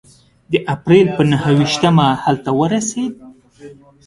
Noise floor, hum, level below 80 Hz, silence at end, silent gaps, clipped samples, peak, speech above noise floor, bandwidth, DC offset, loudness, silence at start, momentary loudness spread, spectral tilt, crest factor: -40 dBFS; none; -50 dBFS; 0.35 s; none; under 0.1%; 0 dBFS; 26 dB; 11.5 kHz; under 0.1%; -15 LUFS; 0.5 s; 9 LU; -6 dB/octave; 16 dB